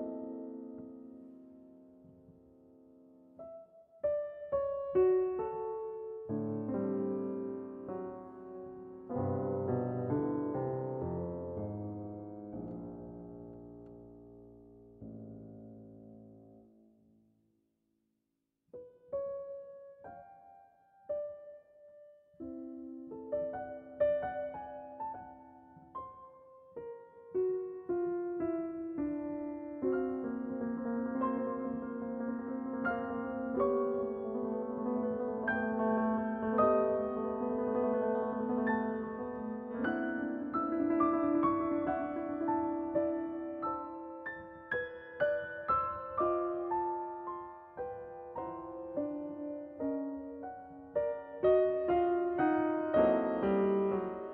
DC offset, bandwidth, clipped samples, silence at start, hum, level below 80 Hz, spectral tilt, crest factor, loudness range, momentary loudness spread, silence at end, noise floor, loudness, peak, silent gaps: under 0.1%; 4.1 kHz; under 0.1%; 0 s; none; -66 dBFS; -7 dB/octave; 20 dB; 15 LU; 20 LU; 0 s; -85 dBFS; -35 LUFS; -16 dBFS; none